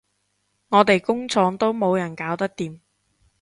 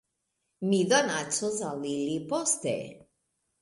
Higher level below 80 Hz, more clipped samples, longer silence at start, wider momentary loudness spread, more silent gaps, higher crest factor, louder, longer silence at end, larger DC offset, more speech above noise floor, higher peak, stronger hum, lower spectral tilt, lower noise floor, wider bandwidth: first, -64 dBFS vs -72 dBFS; neither; about the same, 0.7 s vs 0.6 s; about the same, 10 LU vs 10 LU; neither; about the same, 22 dB vs 20 dB; first, -21 LUFS vs -28 LUFS; about the same, 0.65 s vs 0.65 s; neither; about the same, 50 dB vs 52 dB; first, 0 dBFS vs -10 dBFS; neither; first, -5.5 dB/octave vs -3.5 dB/octave; second, -71 dBFS vs -80 dBFS; about the same, 11.5 kHz vs 11.5 kHz